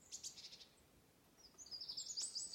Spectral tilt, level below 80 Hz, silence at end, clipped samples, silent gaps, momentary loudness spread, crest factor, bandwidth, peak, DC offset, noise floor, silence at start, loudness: 1 dB/octave; -82 dBFS; 0 s; under 0.1%; none; 20 LU; 18 dB; 16.5 kHz; -34 dBFS; under 0.1%; -71 dBFS; 0 s; -48 LUFS